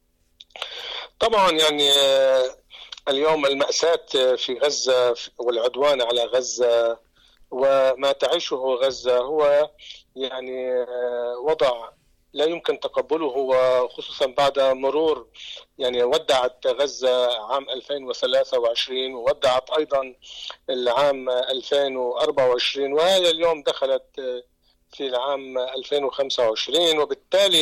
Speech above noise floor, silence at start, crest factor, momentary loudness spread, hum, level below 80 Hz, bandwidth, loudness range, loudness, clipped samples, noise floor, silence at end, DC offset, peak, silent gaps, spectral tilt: 32 dB; 0.55 s; 12 dB; 13 LU; none; -60 dBFS; 15.5 kHz; 4 LU; -21 LUFS; under 0.1%; -53 dBFS; 0 s; under 0.1%; -10 dBFS; none; -2 dB/octave